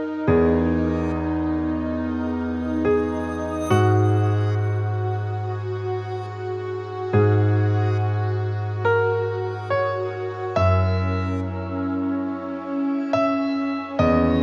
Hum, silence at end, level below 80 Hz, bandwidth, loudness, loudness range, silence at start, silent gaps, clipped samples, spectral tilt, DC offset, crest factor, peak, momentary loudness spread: none; 0 s; -46 dBFS; 9.2 kHz; -23 LUFS; 2 LU; 0 s; none; under 0.1%; -8.5 dB/octave; under 0.1%; 16 dB; -6 dBFS; 9 LU